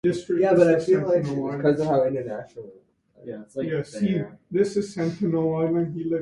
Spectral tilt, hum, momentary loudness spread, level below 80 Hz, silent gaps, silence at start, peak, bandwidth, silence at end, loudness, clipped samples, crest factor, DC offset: -7.5 dB/octave; none; 17 LU; -60 dBFS; none; 0.05 s; -6 dBFS; 11 kHz; 0 s; -23 LUFS; under 0.1%; 18 dB; under 0.1%